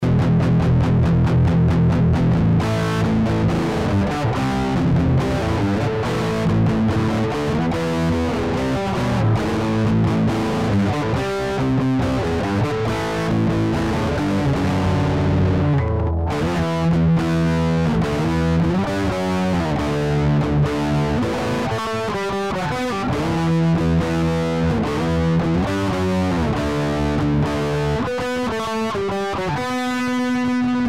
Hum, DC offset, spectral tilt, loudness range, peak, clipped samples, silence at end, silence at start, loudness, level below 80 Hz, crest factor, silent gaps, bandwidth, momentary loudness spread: none; 0.6%; -7 dB/octave; 3 LU; -10 dBFS; under 0.1%; 0 s; 0 s; -20 LUFS; -32 dBFS; 8 dB; none; 13 kHz; 5 LU